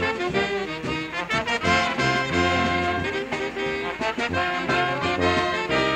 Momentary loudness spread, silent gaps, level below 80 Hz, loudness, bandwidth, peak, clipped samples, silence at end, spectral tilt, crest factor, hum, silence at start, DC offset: 6 LU; none; -46 dBFS; -23 LUFS; 15.5 kHz; -8 dBFS; under 0.1%; 0 s; -4.5 dB/octave; 16 dB; none; 0 s; under 0.1%